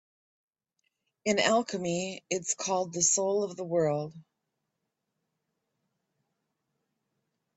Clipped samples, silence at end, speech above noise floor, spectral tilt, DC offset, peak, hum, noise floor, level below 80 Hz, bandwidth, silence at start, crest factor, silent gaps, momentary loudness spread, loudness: under 0.1%; 3.35 s; 55 dB; -3 dB/octave; under 0.1%; -10 dBFS; none; -84 dBFS; -74 dBFS; 8.4 kHz; 1.25 s; 22 dB; none; 9 LU; -29 LUFS